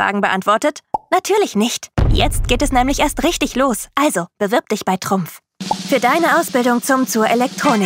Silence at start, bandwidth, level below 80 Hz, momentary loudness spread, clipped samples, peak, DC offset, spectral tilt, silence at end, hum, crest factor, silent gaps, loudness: 0 s; 16.5 kHz; -28 dBFS; 6 LU; under 0.1%; 0 dBFS; under 0.1%; -4 dB/octave; 0 s; none; 16 dB; none; -17 LUFS